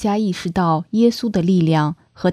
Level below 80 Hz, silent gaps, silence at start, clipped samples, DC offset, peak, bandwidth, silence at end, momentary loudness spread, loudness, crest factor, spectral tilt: -48 dBFS; none; 0 s; under 0.1%; under 0.1%; -4 dBFS; 13.5 kHz; 0 s; 5 LU; -18 LUFS; 14 dB; -7 dB/octave